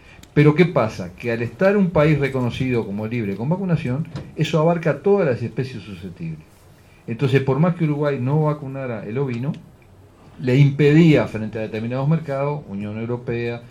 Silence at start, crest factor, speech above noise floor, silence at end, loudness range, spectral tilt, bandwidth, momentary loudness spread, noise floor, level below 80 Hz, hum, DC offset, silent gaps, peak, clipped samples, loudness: 0.35 s; 20 dB; 29 dB; 0 s; 3 LU; -8.5 dB/octave; 8.4 kHz; 14 LU; -48 dBFS; -50 dBFS; none; under 0.1%; none; 0 dBFS; under 0.1%; -20 LUFS